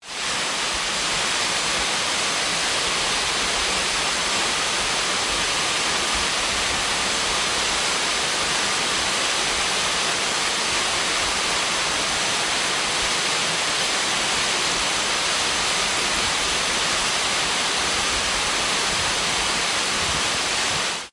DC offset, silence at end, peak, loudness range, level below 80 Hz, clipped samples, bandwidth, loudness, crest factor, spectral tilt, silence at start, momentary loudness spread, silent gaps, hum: under 0.1%; 0.05 s; -8 dBFS; 0 LU; -46 dBFS; under 0.1%; 12 kHz; -20 LUFS; 14 dB; -0.5 dB/octave; 0 s; 1 LU; none; none